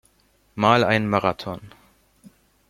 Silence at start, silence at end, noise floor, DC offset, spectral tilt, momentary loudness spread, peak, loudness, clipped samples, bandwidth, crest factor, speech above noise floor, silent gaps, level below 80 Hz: 0.55 s; 1 s; -62 dBFS; under 0.1%; -6 dB/octave; 19 LU; -2 dBFS; -20 LUFS; under 0.1%; 15.5 kHz; 22 dB; 41 dB; none; -56 dBFS